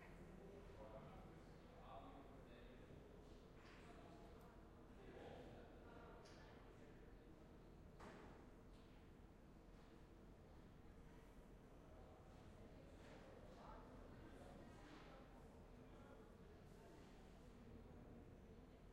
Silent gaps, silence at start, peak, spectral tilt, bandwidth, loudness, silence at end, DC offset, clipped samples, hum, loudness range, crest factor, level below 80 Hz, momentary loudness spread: none; 0 s; -46 dBFS; -6.5 dB/octave; 12 kHz; -64 LUFS; 0 s; under 0.1%; under 0.1%; none; 3 LU; 16 dB; -68 dBFS; 5 LU